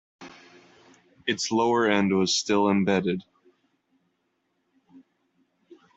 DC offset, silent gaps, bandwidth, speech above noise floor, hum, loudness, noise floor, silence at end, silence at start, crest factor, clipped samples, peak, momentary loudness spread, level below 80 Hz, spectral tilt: under 0.1%; none; 8.2 kHz; 51 dB; none; -24 LUFS; -74 dBFS; 0.2 s; 0.2 s; 22 dB; under 0.1%; -6 dBFS; 12 LU; -68 dBFS; -4.5 dB/octave